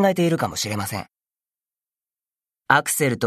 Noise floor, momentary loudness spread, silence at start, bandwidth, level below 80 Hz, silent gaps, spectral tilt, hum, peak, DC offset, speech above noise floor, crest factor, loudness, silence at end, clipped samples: under -90 dBFS; 10 LU; 0 s; 14 kHz; -60 dBFS; none; -4 dB/octave; none; 0 dBFS; under 0.1%; over 69 dB; 22 dB; -21 LUFS; 0 s; under 0.1%